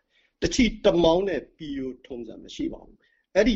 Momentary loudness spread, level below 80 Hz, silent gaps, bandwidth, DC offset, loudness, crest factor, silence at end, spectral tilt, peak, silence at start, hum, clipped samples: 18 LU; -42 dBFS; none; 8.2 kHz; under 0.1%; -25 LUFS; 20 dB; 0 s; -5 dB/octave; -6 dBFS; 0.4 s; none; under 0.1%